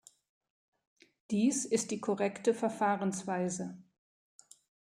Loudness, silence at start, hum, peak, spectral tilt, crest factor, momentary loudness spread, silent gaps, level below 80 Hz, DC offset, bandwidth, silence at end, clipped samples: -33 LUFS; 1.3 s; none; -16 dBFS; -5 dB/octave; 18 dB; 6 LU; none; -80 dBFS; under 0.1%; 14.5 kHz; 1.1 s; under 0.1%